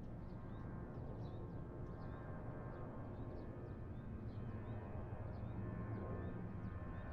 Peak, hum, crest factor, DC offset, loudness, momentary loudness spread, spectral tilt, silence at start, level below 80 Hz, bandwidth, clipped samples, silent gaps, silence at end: -34 dBFS; none; 12 dB; under 0.1%; -50 LUFS; 4 LU; -9 dB/octave; 0 s; -56 dBFS; 5.4 kHz; under 0.1%; none; 0 s